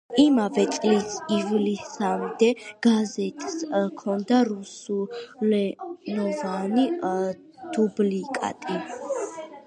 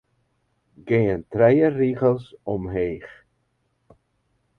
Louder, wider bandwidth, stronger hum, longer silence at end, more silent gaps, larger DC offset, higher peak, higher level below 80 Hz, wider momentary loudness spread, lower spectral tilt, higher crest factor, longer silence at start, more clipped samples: second, -25 LUFS vs -21 LUFS; first, 10.5 kHz vs 5 kHz; neither; second, 0.05 s vs 1.5 s; neither; neither; about the same, -6 dBFS vs -4 dBFS; second, -72 dBFS vs -50 dBFS; about the same, 10 LU vs 12 LU; second, -5.5 dB/octave vs -10 dB/octave; about the same, 18 dB vs 20 dB; second, 0.1 s vs 0.85 s; neither